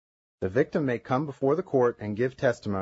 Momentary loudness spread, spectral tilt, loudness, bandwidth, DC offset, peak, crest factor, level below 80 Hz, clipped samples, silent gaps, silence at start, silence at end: 5 LU; -8 dB/octave; -27 LUFS; 8 kHz; under 0.1%; -10 dBFS; 18 dB; -62 dBFS; under 0.1%; none; 0.4 s; 0 s